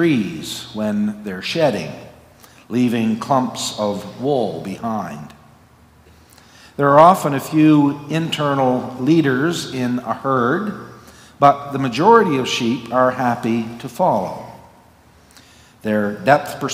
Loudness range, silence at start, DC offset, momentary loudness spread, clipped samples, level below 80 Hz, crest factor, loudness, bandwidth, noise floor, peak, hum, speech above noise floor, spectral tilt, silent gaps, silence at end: 6 LU; 0 s; under 0.1%; 15 LU; under 0.1%; -58 dBFS; 18 dB; -18 LUFS; 16 kHz; -49 dBFS; 0 dBFS; none; 32 dB; -5.5 dB/octave; none; 0 s